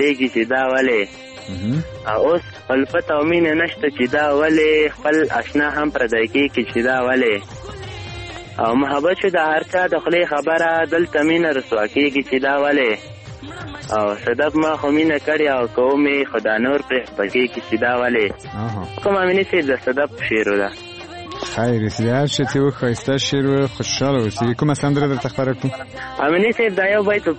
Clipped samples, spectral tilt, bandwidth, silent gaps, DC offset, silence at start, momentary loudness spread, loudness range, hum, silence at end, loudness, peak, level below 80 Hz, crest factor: under 0.1%; -5.5 dB/octave; 8.8 kHz; none; under 0.1%; 0 s; 10 LU; 3 LU; none; 0 s; -18 LUFS; -4 dBFS; -48 dBFS; 14 dB